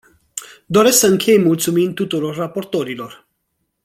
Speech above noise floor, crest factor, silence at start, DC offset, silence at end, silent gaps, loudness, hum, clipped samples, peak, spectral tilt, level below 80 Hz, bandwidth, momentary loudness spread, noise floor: 56 dB; 16 dB; 0.35 s; under 0.1%; 0.7 s; none; -16 LUFS; none; under 0.1%; 0 dBFS; -4 dB/octave; -58 dBFS; 16.5 kHz; 19 LU; -71 dBFS